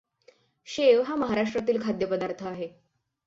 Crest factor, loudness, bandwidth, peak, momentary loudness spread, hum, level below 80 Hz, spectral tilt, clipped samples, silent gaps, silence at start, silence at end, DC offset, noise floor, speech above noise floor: 18 dB; -26 LUFS; 7.8 kHz; -8 dBFS; 15 LU; none; -64 dBFS; -5.5 dB/octave; under 0.1%; none; 0.65 s; 0.6 s; under 0.1%; -61 dBFS; 35 dB